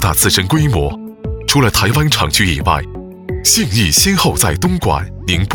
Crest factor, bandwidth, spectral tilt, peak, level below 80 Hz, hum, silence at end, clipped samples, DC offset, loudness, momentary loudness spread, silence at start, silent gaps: 14 dB; 20 kHz; -3.5 dB/octave; 0 dBFS; -26 dBFS; none; 0 s; under 0.1%; under 0.1%; -13 LUFS; 11 LU; 0 s; none